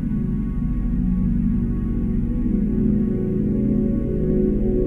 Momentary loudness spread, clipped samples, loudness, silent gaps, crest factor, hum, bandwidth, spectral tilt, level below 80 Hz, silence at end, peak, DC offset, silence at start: 4 LU; under 0.1%; -22 LUFS; none; 12 dB; none; 3 kHz; -12 dB/octave; -26 dBFS; 0 s; -8 dBFS; under 0.1%; 0 s